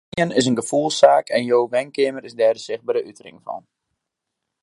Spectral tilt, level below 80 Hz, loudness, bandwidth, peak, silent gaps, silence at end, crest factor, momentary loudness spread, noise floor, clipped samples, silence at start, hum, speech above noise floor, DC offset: -4.5 dB/octave; -66 dBFS; -19 LUFS; 11.5 kHz; 0 dBFS; none; 1.05 s; 20 dB; 19 LU; -81 dBFS; under 0.1%; 0.15 s; none; 61 dB; under 0.1%